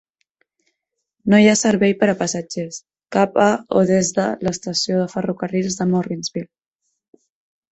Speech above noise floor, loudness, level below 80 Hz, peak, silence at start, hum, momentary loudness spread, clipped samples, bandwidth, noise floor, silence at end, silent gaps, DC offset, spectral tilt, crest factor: 60 dB; -18 LUFS; -56 dBFS; -2 dBFS; 1.25 s; none; 14 LU; under 0.1%; 8.4 kHz; -78 dBFS; 1.3 s; none; under 0.1%; -5 dB/octave; 18 dB